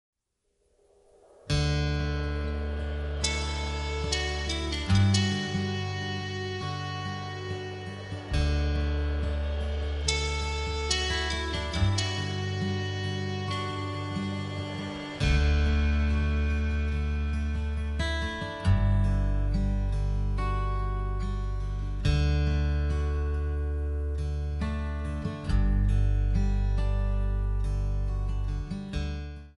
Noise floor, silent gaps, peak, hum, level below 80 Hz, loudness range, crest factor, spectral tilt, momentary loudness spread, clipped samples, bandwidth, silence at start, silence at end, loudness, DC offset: -76 dBFS; none; -10 dBFS; none; -30 dBFS; 3 LU; 18 dB; -5.5 dB/octave; 8 LU; under 0.1%; 11 kHz; 1.45 s; 0.05 s; -30 LUFS; under 0.1%